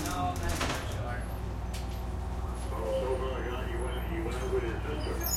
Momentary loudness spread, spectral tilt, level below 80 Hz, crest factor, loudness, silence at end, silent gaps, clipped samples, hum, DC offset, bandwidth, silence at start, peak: 5 LU; -5 dB/octave; -36 dBFS; 14 dB; -34 LUFS; 0 s; none; under 0.1%; none; under 0.1%; 16 kHz; 0 s; -18 dBFS